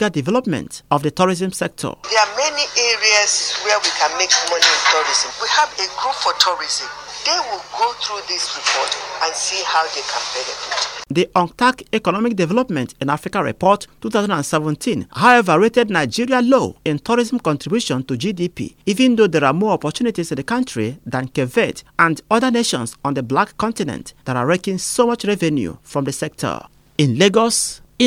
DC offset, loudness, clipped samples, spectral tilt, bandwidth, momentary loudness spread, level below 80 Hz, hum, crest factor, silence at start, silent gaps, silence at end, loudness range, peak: under 0.1%; -18 LUFS; under 0.1%; -3.5 dB/octave; 16.5 kHz; 10 LU; -54 dBFS; none; 18 dB; 0 s; none; 0 s; 5 LU; 0 dBFS